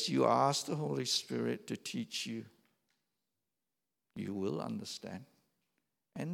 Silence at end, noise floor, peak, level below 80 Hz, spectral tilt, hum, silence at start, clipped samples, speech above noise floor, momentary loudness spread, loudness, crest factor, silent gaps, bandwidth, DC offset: 0 s; under -90 dBFS; -14 dBFS; -84 dBFS; -4.5 dB/octave; none; 0 s; under 0.1%; over 54 dB; 16 LU; -36 LUFS; 22 dB; none; 17 kHz; under 0.1%